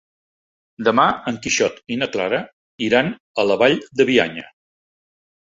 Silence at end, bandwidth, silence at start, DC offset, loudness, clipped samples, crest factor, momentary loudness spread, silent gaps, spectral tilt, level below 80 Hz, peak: 0.95 s; 7.8 kHz; 0.8 s; under 0.1%; -19 LUFS; under 0.1%; 20 dB; 9 LU; 2.53-2.78 s, 3.20-3.35 s; -3.5 dB/octave; -58 dBFS; 0 dBFS